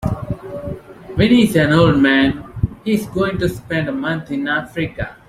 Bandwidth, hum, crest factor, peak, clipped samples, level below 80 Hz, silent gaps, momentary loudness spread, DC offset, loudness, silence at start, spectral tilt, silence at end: 15.5 kHz; none; 16 dB; -2 dBFS; under 0.1%; -38 dBFS; none; 15 LU; under 0.1%; -17 LUFS; 0 s; -6.5 dB/octave; 0.15 s